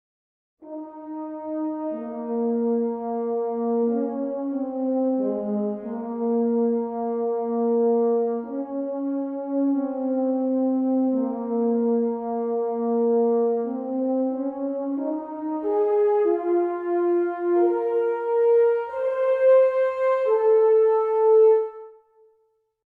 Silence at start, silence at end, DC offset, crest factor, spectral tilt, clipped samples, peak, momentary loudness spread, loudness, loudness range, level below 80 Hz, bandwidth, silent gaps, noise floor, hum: 0.6 s; 0.95 s; under 0.1%; 14 dB; -10 dB/octave; under 0.1%; -10 dBFS; 11 LU; -23 LUFS; 6 LU; -72 dBFS; 3.3 kHz; none; -68 dBFS; none